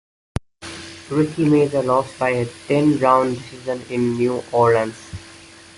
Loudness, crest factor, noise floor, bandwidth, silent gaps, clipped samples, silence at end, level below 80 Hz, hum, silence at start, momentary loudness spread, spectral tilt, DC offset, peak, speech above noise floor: -19 LUFS; 18 dB; -43 dBFS; 11.5 kHz; none; under 0.1%; 0.4 s; -48 dBFS; none; 0.6 s; 18 LU; -6.5 dB/octave; under 0.1%; -2 dBFS; 24 dB